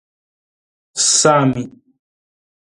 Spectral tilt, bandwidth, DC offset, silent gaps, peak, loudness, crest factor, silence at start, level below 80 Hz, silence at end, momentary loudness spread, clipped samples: -3 dB/octave; 11.5 kHz; under 0.1%; none; 0 dBFS; -13 LUFS; 20 dB; 0.95 s; -58 dBFS; 1 s; 18 LU; under 0.1%